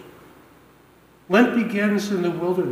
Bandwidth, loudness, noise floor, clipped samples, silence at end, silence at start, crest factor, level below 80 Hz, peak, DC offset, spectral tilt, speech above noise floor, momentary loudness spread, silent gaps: 16 kHz; -21 LUFS; -53 dBFS; under 0.1%; 0 s; 0 s; 18 dB; -66 dBFS; -4 dBFS; under 0.1%; -6 dB/octave; 33 dB; 6 LU; none